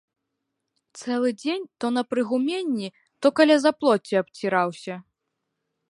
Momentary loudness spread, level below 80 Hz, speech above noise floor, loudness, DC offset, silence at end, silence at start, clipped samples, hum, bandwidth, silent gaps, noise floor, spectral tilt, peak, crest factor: 17 LU; -78 dBFS; 58 dB; -23 LUFS; under 0.1%; 0.9 s; 0.95 s; under 0.1%; none; 11.5 kHz; none; -80 dBFS; -5 dB/octave; -6 dBFS; 20 dB